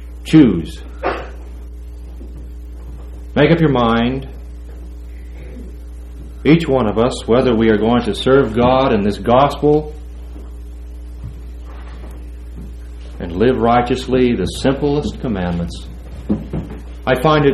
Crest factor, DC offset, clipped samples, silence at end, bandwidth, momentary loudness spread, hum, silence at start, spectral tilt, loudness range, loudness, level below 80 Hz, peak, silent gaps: 16 dB; under 0.1%; under 0.1%; 0 s; 13 kHz; 21 LU; none; 0 s; -7 dB/octave; 7 LU; -15 LUFS; -30 dBFS; 0 dBFS; none